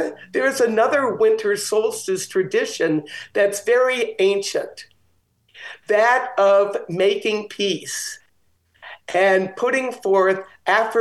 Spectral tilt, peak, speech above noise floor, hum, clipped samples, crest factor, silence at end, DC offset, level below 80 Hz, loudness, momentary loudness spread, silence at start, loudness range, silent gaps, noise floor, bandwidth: -3.5 dB/octave; -2 dBFS; 44 dB; none; under 0.1%; 18 dB; 0 s; under 0.1%; -72 dBFS; -20 LUFS; 10 LU; 0 s; 2 LU; none; -64 dBFS; 12.5 kHz